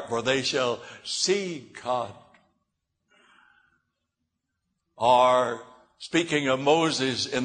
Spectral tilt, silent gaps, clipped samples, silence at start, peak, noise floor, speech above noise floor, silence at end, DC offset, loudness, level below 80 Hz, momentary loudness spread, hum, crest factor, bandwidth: -3.5 dB/octave; none; under 0.1%; 0 s; -8 dBFS; -81 dBFS; 56 dB; 0 s; under 0.1%; -25 LUFS; -68 dBFS; 15 LU; none; 20 dB; 9.6 kHz